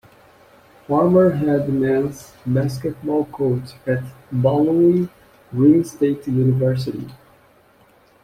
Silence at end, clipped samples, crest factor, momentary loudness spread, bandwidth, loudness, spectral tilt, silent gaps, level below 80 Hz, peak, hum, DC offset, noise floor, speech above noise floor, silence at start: 1.1 s; under 0.1%; 16 dB; 12 LU; 15 kHz; -19 LUFS; -8.5 dB/octave; none; -54 dBFS; -4 dBFS; none; under 0.1%; -53 dBFS; 35 dB; 0.9 s